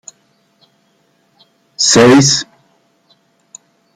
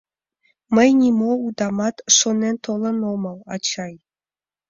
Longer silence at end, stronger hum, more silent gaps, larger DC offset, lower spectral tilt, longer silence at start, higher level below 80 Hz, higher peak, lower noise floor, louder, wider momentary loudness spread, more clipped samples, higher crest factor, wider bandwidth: first, 1.55 s vs 0.75 s; neither; neither; neither; about the same, -3.5 dB/octave vs -3 dB/octave; first, 1.8 s vs 0.7 s; first, -50 dBFS vs -62 dBFS; about the same, 0 dBFS vs -2 dBFS; second, -57 dBFS vs under -90 dBFS; first, -9 LUFS vs -19 LUFS; about the same, 11 LU vs 12 LU; neither; about the same, 16 dB vs 20 dB; first, 14 kHz vs 7.6 kHz